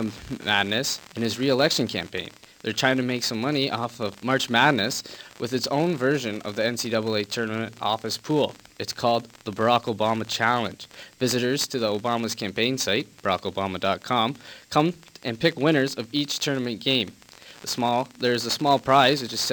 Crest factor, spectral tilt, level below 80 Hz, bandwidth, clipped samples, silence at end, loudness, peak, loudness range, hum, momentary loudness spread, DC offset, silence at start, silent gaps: 20 dB; -4 dB/octave; -62 dBFS; 19 kHz; under 0.1%; 0 s; -24 LUFS; -4 dBFS; 2 LU; none; 10 LU; under 0.1%; 0 s; none